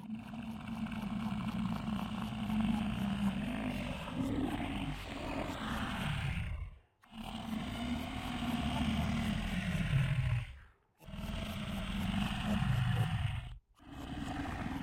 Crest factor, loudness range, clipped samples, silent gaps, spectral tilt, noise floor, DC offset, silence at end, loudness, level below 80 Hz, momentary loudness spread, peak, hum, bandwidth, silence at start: 16 dB; 3 LU; under 0.1%; none; -6.5 dB/octave; -60 dBFS; under 0.1%; 0 s; -38 LUFS; -48 dBFS; 11 LU; -20 dBFS; none; 16.5 kHz; 0 s